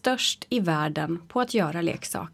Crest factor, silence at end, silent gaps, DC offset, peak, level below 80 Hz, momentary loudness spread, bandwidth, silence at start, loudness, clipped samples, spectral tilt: 16 dB; 0.05 s; none; under 0.1%; -10 dBFS; -62 dBFS; 4 LU; 16 kHz; 0.05 s; -26 LUFS; under 0.1%; -4 dB/octave